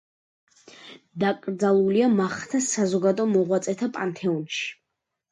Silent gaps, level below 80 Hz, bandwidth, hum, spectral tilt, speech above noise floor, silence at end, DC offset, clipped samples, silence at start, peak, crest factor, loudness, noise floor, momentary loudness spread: none; -70 dBFS; 11 kHz; none; -5 dB/octave; 59 dB; 0.6 s; under 0.1%; under 0.1%; 0.8 s; -10 dBFS; 14 dB; -24 LUFS; -82 dBFS; 9 LU